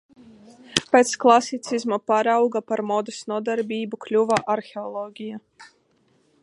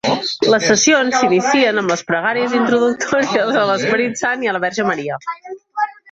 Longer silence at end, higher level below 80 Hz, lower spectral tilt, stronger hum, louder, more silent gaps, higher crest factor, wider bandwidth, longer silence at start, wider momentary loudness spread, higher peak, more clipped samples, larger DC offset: first, 0.8 s vs 0.2 s; second, -68 dBFS vs -58 dBFS; about the same, -3.5 dB/octave vs -3 dB/octave; neither; second, -22 LUFS vs -16 LUFS; neither; first, 24 dB vs 14 dB; first, 11.5 kHz vs 8.2 kHz; first, 0.7 s vs 0.05 s; first, 15 LU vs 10 LU; about the same, 0 dBFS vs -2 dBFS; neither; neither